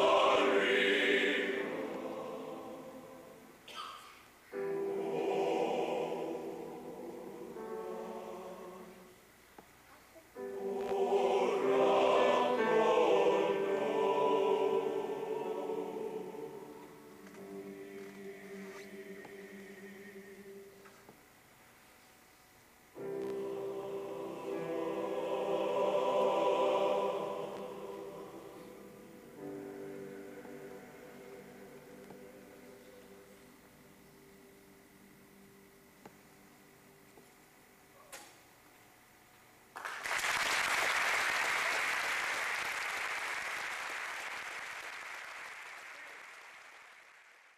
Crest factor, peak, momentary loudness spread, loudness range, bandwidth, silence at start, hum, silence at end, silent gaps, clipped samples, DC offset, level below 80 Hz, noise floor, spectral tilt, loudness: 18 dB; -18 dBFS; 24 LU; 21 LU; 15 kHz; 0 s; none; 0.25 s; none; under 0.1%; under 0.1%; -76 dBFS; -62 dBFS; -3 dB/octave; -34 LUFS